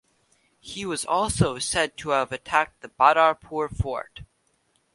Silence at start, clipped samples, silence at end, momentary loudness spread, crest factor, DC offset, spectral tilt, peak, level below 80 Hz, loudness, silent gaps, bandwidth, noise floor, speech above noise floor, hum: 0.65 s; under 0.1%; 0.7 s; 13 LU; 22 dB; under 0.1%; -4 dB/octave; -2 dBFS; -44 dBFS; -24 LUFS; none; 11.5 kHz; -68 dBFS; 44 dB; none